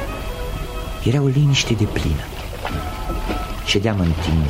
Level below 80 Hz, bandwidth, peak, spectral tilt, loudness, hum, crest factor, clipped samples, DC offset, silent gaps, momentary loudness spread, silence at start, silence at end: -28 dBFS; 16 kHz; -4 dBFS; -5.5 dB/octave; -21 LUFS; none; 16 dB; under 0.1%; under 0.1%; none; 12 LU; 0 s; 0 s